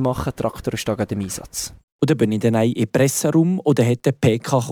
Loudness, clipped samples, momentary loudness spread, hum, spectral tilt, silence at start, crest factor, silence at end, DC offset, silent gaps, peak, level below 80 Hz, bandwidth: -20 LUFS; under 0.1%; 9 LU; none; -6 dB/octave; 0 s; 16 dB; 0 s; under 0.1%; 1.84-1.99 s; -4 dBFS; -46 dBFS; over 20 kHz